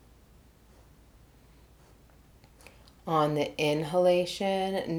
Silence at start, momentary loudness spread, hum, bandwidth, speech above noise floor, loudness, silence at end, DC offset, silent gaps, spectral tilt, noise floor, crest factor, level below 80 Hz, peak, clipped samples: 3.05 s; 5 LU; none; 18.5 kHz; 30 dB; -28 LUFS; 0 s; under 0.1%; none; -5.5 dB/octave; -58 dBFS; 20 dB; -60 dBFS; -12 dBFS; under 0.1%